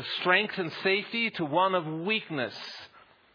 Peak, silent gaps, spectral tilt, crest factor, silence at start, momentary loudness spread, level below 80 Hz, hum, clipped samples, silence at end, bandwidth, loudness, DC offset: -8 dBFS; none; -6 dB/octave; 20 dB; 0 s; 12 LU; -80 dBFS; none; under 0.1%; 0.35 s; 5.2 kHz; -28 LUFS; under 0.1%